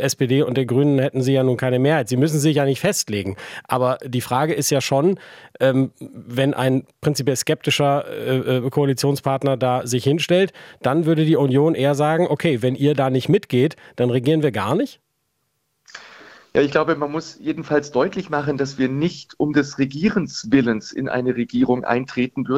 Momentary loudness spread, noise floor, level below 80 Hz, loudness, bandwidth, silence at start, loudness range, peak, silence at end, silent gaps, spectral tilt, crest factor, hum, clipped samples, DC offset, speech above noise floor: 7 LU; -71 dBFS; -58 dBFS; -20 LUFS; 16.5 kHz; 0 s; 4 LU; -2 dBFS; 0 s; none; -5.5 dB/octave; 18 dB; none; under 0.1%; under 0.1%; 52 dB